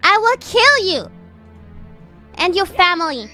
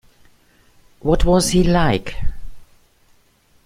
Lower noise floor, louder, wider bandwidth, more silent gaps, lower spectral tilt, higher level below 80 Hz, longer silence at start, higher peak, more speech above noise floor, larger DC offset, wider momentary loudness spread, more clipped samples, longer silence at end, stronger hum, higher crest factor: second, -41 dBFS vs -56 dBFS; first, -14 LUFS vs -18 LUFS; about the same, 15.5 kHz vs 15.5 kHz; neither; second, -2.5 dB/octave vs -5.5 dB/octave; second, -46 dBFS vs -28 dBFS; second, 0.05 s vs 1.05 s; about the same, 0 dBFS vs -2 dBFS; second, 25 dB vs 41 dB; neither; second, 12 LU vs 16 LU; neither; second, 0.05 s vs 1 s; neither; about the same, 18 dB vs 18 dB